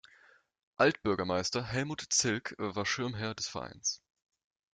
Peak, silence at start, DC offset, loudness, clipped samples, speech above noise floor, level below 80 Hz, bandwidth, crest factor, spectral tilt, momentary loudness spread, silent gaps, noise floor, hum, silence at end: -12 dBFS; 0.8 s; under 0.1%; -32 LUFS; under 0.1%; 31 dB; -66 dBFS; 11 kHz; 22 dB; -3 dB/octave; 8 LU; none; -63 dBFS; none; 0.75 s